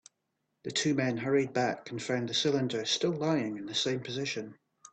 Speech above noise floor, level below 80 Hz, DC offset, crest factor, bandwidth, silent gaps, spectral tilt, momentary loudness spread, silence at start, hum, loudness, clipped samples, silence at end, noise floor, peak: 50 dB; -72 dBFS; under 0.1%; 16 dB; 9.2 kHz; none; -4 dB/octave; 7 LU; 0.65 s; none; -31 LUFS; under 0.1%; 0.05 s; -81 dBFS; -16 dBFS